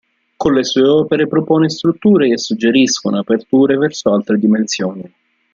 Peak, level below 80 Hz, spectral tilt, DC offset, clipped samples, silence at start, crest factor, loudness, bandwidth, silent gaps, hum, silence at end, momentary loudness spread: -2 dBFS; -54 dBFS; -5 dB/octave; under 0.1%; under 0.1%; 0.4 s; 12 dB; -14 LUFS; 7.6 kHz; none; none; 0.45 s; 5 LU